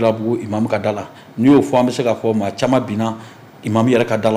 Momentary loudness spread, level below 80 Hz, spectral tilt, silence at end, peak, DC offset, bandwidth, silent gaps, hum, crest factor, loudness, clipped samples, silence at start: 12 LU; -56 dBFS; -6.5 dB/octave; 0 s; -4 dBFS; under 0.1%; 15.5 kHz; none; none; 12 dB; -17 LUFS; under 0.1%; 0 s